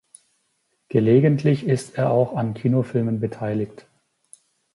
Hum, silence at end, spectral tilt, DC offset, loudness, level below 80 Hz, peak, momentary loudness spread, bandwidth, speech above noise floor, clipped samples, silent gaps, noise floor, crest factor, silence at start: none; 1.05 s; -8.5 dB/octave; under 0.1%; -21 LUFS; -60 dBFS; -4 dBFS; 10 LU; 11.5 kHz; 50 dB; under 0.1%; none; -70 dBFS; 18 dB; 0.9 s